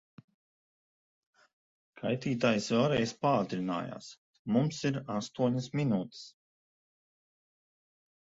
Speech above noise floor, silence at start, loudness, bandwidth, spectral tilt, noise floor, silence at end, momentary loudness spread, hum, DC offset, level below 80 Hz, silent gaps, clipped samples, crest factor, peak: over 59 dB; 1.95 s; -31 LUFS; 8 kHz; -6 dB/octave; under -90 dBFS; 2 s; 16 LU; none; under 0.1%; -68 dBFS; 4.18-4.45 s; under 0.1%; 20 dB; -14 dBFS